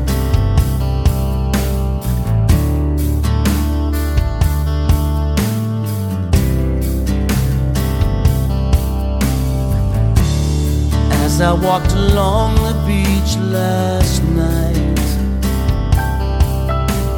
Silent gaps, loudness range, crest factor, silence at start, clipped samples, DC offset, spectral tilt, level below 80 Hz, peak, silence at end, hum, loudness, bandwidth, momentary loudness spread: none; 2 LU; 14 dB; 0 s; under 0.1%; under 0.1%; -6.5 dB/octave; -18 dBFS; 0 dBFS; 0 s; none; -16 LUFS; 17.5 kHz; 4 LU